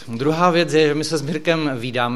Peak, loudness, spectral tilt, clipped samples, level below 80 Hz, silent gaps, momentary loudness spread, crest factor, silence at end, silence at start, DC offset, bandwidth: -2 dBFS; -19 LUFS; -5 dB/octave; under 0.1%; -58 dBFS; none; 6 LU; 16 dB; 0 s; 0 s; 1%; 14 kHz